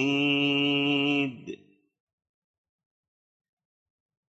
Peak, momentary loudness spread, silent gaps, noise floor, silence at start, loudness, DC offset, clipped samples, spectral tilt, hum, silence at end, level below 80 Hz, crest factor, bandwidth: -14 dBFS; 19 LU; none; -46 dBFS; 0 s; -25 LUFS; under 0.1%; under 0.1%; -5.5 dB/octave; none; 2.75 s; -78 dBFS; 16 dB; 8 kHz